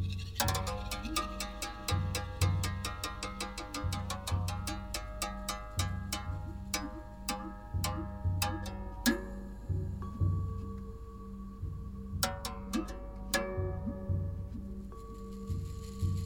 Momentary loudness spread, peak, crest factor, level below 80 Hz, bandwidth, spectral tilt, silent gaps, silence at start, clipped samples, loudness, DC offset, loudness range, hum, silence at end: 11 LU; -10 dBFS; 26 dB; -44 dBFS; 18 kHz; -4.5 dB/octave; none; 0 s; under 0.1%; -37 LUFS; 0.1%; 3 LU; none; 0 s